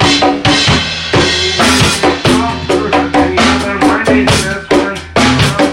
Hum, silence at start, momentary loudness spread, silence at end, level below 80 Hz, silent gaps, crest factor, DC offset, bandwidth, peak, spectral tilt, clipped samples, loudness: none; 0 s; 4 LU; 0 s; -30 dBFS; none; 10 dB; under 0.1%; 16.5 kHz; 0 dBFS; -4 dB/octave; under 0.1%; -10 LUFS